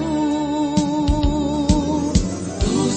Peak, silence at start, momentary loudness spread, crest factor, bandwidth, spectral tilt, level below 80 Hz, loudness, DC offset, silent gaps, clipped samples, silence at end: -2 dBFS; 0 s; 2 LU; 16 dB; 8.8 kHz; -6 dB/octave; -26 dBFS; -20 LUFS; under 0.1%; none; under 0.1%; 0 s